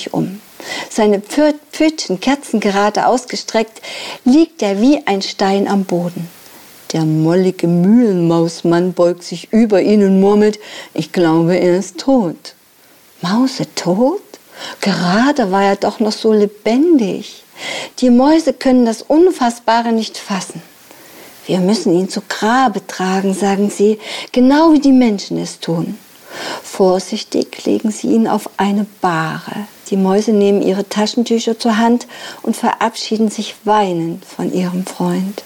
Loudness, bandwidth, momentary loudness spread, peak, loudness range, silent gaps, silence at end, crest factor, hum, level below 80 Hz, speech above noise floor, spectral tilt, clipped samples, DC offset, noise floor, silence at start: -14 LUFS; 19 kHz; 13 LU; -2 dBFS; 4 LU; none; 0 s; 12 dB; none; -52 dBFS; 33 dB; -5.5 dB/octave; under 0.1%; under 0.1%; -47 dBFS; 0 s